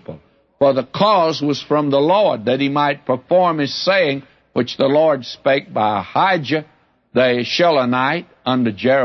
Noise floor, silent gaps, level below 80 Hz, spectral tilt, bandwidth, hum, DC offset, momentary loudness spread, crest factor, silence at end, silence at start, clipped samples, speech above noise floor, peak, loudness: -40 dBFS; none; -62 dBFS; -6 dB/octave; 6.6 kHz; none; under 0.1%; 8 LU; 14 dB; 0 s; 0.1 s; under 0.1%; 24 dB; -2 dBFS; -17 LUFS